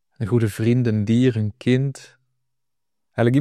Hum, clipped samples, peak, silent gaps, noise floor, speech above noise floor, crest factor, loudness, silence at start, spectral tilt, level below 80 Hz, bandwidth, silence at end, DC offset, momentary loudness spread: none; under 0.1%; -6 dBFS; none; -84 dBFS; 65 dB; 16 dB; -21 LUFS; 0.2 s; -8 dB/octave; -60 dBFS; 13.5 kHz; 0 s; under 0.1%; 9 LU